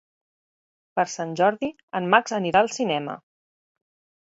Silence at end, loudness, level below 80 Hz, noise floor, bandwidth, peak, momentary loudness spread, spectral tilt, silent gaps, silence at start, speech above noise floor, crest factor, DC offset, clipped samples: 1.05 s; -23 LUFS; -68 dBFS; under -90 dBFS; 8 kHz; -4 dBFS; 11 LU; -4 dB/octave; 1.83-1.88 s; 0.95 s; over 67 dB; 22 dB; under 0.1%; under 0.1%